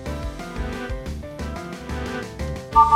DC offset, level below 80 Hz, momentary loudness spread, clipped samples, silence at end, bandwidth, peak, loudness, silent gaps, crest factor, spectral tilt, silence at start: under 0.1%; -34 dBFS; 10 LU; under 0.1%; 0 s; 15.5 kHz; -2 dBFS; -27 LUFS; none; 22 dB; -6 dB/octave; 0 s